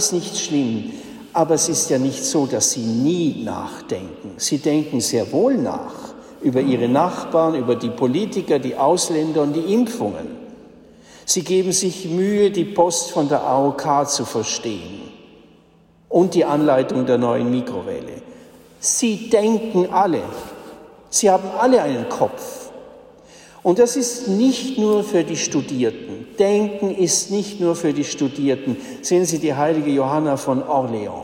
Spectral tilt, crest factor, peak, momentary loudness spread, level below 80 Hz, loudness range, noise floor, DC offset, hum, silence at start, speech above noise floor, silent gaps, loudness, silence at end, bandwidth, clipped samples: -4.5 dB/octave; 16 dB; -4 dBFS; 12 LU; -60 dBFS; 2 LU; -53 dBFS; under 0.1%; none; 0 s; 34 dB; none; -19 LUFS; 0 s; 16.5 kHz; under 0.1%